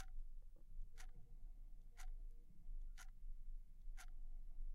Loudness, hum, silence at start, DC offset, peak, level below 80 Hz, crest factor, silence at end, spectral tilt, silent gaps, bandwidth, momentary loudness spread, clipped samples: -62 LUFS; none; 0 s; under 0.1%; -38 dBFS; -52 dBFS; 12 dB; 0 s; -3.5 dB/octave; none; 12 kHz; 6 LU; under 0.1%